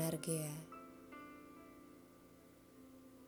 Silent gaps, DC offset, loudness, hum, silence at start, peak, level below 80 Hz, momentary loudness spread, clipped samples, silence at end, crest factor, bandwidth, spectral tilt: none; under 0.1%; -46 LUFS; none; 0 s; -24 dBFS; -78 dBFS; 22 LU; under 0.1%; 0 s; 24 dB; over 20 kHz; -5 dB/octave